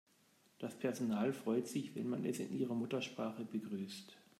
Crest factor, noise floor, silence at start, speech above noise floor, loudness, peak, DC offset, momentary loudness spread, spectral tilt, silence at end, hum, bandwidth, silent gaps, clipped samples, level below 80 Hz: 16 dB; -72 dBFS; 0.6 s; 32 dB; -41 LUFS; -26 dBFS; under 0.1%; 9 LU; -6 dB/octave; 0.2 s; none; 15 kHz; none; under 0.1%; -86 dBFS